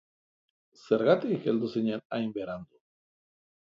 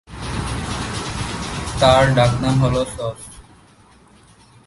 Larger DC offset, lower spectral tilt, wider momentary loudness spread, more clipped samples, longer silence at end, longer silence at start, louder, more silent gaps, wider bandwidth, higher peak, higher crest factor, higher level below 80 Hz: neither; first, -8 dB/octave vs -5.5 dB/octave; about the same, 13 LU vs 15 LU; neither; second, 1.05 s vs 1.25 s; first, 0.85 s vs 0.1 s; second, -29 LUFS vs -19 LUFS; first, 2.05-2.10 s vs none; second, 7.4 kHz vs 11.5 kHz; second, -8 dBFS vs 0 dBFS; about the same, 22 dB vs 20 dB; second, -72 dBFS vs -34 dBFS